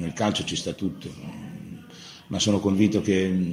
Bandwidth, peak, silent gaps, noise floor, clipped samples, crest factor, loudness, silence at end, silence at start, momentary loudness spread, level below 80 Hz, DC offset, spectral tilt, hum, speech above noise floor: 15 kHz; -8 dBFS; none; -45 dBFS; under 0.1%; 18 dB; -24 LUFS; 0 s; 0 s; 20 LU; -56 dBFS; under 0.1%; -5 dB/octave; none; 21 dB